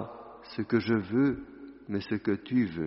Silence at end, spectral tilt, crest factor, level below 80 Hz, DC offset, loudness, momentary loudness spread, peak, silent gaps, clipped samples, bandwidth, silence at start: 0 s; -6.5 dB/octave; 16 dB; -60 dBFS; under 0.1%; -30 LUFS; 18 LU; -14 dBFS; none; under 0.1%; 5.8 kHz; 0 s